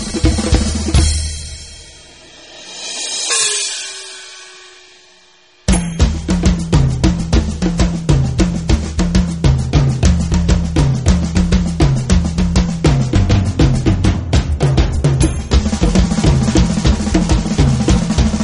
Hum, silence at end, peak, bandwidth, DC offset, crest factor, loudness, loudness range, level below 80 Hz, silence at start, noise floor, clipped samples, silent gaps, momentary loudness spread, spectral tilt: none; 0 s; 0 dBFS; 11 kHz; 0.2%; 14 dB; -15 LUFS; 5 LU; -18 dBFS; 0 s; -48 dBFS; under 0.1%; none; 11 LU; -5.5 dB/octave